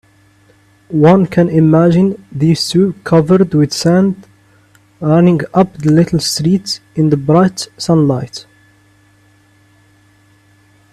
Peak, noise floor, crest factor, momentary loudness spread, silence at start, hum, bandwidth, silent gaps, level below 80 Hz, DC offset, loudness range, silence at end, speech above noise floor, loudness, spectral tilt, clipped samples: 0 dBFS; -49 dBFS; 14 dB; 10 LU; 0.9 s; none; 13.5 kHz; none; -48 dBFS; under 0.1%; 6 LU; 2.5 s; 38 dB; -12 LUFS; -6.5 dB/octave; under 0.1%